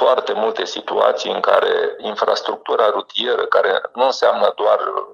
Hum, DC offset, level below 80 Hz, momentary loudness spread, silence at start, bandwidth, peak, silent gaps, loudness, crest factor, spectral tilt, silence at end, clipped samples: none; under 0.1%; -68 dBFS; 5 LU; 0 s; 9.6 kHz; 0 dBFS; none; -18 LUFS; 16 dB; -2.5 dB/octave; 0 s; under 0.1%